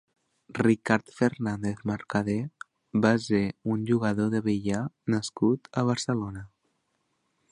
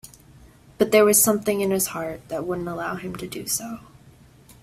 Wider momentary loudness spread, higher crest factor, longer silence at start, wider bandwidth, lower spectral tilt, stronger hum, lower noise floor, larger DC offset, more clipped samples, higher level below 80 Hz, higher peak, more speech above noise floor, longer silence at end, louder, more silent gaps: second, 8 LU vs 16 LU; about the same, 22 dB vs 20 dB; first, 0.5 s vs 0.05 s; second, 11 kHz vs 16 kHz; first, -6.5 dB/octave vs -3.5 dB/octave; neither; first, -75 dBFS vs -51 dBFS; neither; neither; about the same, -58 dBFS vs -56 dBFS; about the same, -6 dBFS vs -4 dBFS; first, 49 dB vs 28 dB; first, 1.05 s vs 0.85 s; second, -27 LUFS vs -22 LUFS; neither